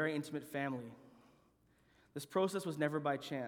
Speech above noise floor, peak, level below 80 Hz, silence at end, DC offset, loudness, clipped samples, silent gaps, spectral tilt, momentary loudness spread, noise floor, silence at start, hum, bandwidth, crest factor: 33 dB; -20 dBFS; -80 dBFS; 0 s; under 0.1%; -39 LUFS; under 0.1%; none; -5.5 dB/octave; 13 LU; -72 dBFS; 0 s; none; 19.5 kHz; 20 dB